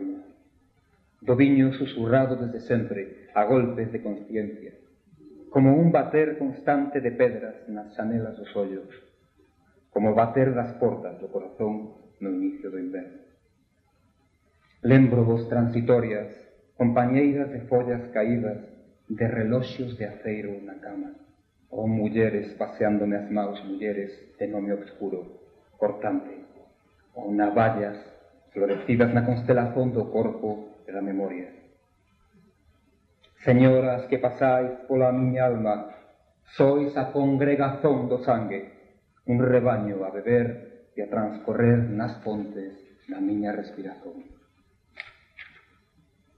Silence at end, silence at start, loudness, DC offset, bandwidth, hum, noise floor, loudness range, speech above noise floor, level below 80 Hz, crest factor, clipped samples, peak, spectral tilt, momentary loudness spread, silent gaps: 0.95 s; 0 s; -25 LUFS; under 0.1%; 5.6 kHz; none; -67 dBFS; 8 LU; 42 dB; -60 dBFS; 20 dB; under 0.1%; -6 dBFS; -10.5 dB/octave; 17 LU; none